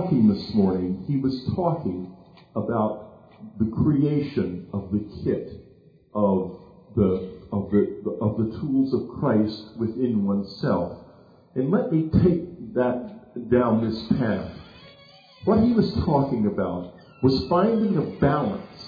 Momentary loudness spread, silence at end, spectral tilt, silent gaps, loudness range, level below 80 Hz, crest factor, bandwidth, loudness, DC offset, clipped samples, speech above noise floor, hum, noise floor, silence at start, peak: 12 LU; 0 s; -10 dB/octave; none; 4 LU; -48 dBFS; 16 dB; 5 kHz; -24 LUFS; under 0.1%; under 0.1%; 30 dB; none; -53 dBFS; 0 s; -8 dBFS